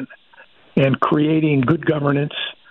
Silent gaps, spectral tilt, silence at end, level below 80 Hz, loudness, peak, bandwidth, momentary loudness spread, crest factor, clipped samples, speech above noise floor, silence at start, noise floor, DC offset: none; -9.5 dB/octave; 0.2 s; -54 dBFS; -18 LUFS; -4 dBFS; 4.2 kHz; 8 LU; 14 dB; under 0.1%; 32 dB; 0 s; -49 dBFS; under 0.1%